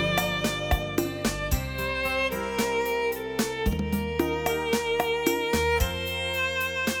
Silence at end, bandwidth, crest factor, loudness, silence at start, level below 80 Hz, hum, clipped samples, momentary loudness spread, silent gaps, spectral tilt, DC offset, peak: 0 s; 18 kHz; 18 dB; -27 LUFS; 0 s; -36 dBFS; none; under 0.1%; 4 LU; none; -4 dB/octave; under 0.1%; -10 dBFS